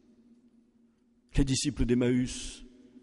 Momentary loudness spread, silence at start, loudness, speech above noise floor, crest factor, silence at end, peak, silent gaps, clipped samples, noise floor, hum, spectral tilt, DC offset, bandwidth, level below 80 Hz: 15 LU; 1.35 s; -29 LUFS; 38 dB; 18 dB; 0.4 s; -12 dBFS; none; under 0.1%; -66 dBFS; none; -5 dB/octave; under 0.1%; 11.5 kHz; -40 dBFS